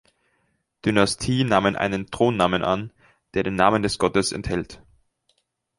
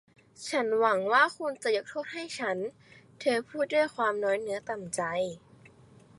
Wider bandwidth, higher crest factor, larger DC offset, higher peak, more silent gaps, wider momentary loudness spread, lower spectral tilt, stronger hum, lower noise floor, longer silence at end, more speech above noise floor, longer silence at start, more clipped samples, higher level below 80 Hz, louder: about the same, 11.5 kHz vs 11.5 kHz; about the same, 22 dB vs 20 dB; neither; first, -2 dBFS vs -10 dBFS; neither; second, 9 LU vs 12 LU; first, -5 dB/octave vs -3.5 dB/octave; neither; first, -70 dBFS vs -56 dBFS; first, 1 s vs 0.5 s; first, 49 dB vs 27 dB; first, 0.85 s vs 0.4 s; neither; first, -46 dBFS vs -72 dBFS; first, -22 LUFS vs -29 LUFS